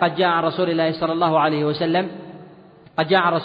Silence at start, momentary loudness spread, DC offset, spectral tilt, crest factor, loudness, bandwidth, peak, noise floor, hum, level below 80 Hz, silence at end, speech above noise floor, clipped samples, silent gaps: 0 s; 12 LU; under 0.1%; -8.5 dB/octave; 16 dB; -20 LUFS; 5.2 kHz; -4 dBFS; -46 dBFS; none; -62 dBFS; 0 s; 27 dB; under 0.1%; none